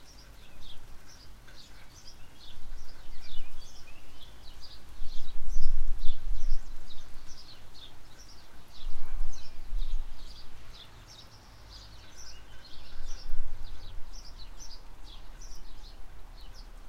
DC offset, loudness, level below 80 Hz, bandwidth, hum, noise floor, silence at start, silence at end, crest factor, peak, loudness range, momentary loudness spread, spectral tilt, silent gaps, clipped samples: under 0.1%; -46 LUFS; -34 dBFS; 6.4 kHz; none; -50 dBFS; 0 s; 0 s; 18 dB; -6 dBFS; 9 LU; 12 LU; -4 dB/octave; none; under 0.1%